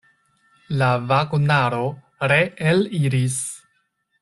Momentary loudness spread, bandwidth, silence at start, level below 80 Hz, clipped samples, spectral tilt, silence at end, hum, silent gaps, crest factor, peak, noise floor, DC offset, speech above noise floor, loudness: 10 LU; 12.5 kHz; 0.7 s; -56 dBFS; under 0.1%; -5.5 dB/octave; 0.65 s; none; none; 18 dB; -4 dBFS; -68 dBFS; under 0.1%; 49 dB; -20 LUFS